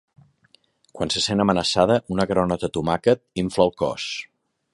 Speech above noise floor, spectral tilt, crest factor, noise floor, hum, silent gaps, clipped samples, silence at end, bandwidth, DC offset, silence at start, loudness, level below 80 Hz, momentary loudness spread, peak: 39 dB; -5 dB/octave; 20 dB; -61 dBFS; none; none; under 0.1%; 0.5 s; 11.5 kHz; under 0.1%; 0.95 s; -22 LUFS; -48 dBFS; 8 LU; -2 dBFS